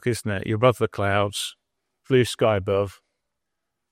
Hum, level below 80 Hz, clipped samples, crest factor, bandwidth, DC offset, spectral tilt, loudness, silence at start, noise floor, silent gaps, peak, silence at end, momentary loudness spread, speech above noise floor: none; -60 dBFS; under 0.1%; 18 dB; 16 kHz; under 0.1%; -5.5 dB/octave; -23 LUFS; 0.05 s; -82 dBFS; none; -6 dBFS; 1 s; 8 LU; 60 dB